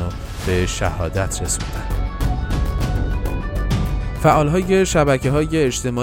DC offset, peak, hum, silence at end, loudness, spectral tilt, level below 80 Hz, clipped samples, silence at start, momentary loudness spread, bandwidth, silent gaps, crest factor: under 0.1%; -2 dBFS; none; 0 s; -20 LUFS; -5.5 dB/octave; -24 dBFS; under 0.1%; 0 s; 9 LU; 17 kHz; none; 16 dB